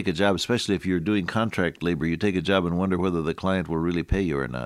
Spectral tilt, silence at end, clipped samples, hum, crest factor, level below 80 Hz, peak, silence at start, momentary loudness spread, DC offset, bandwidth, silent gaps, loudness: -6 dB/octave; 0 s; under 0.1%; none; 18 dB; -42 dBFS; -6 dBFS; 0 s; 3 LU; under 0.1%; 14 kHz; none; -25 LUFS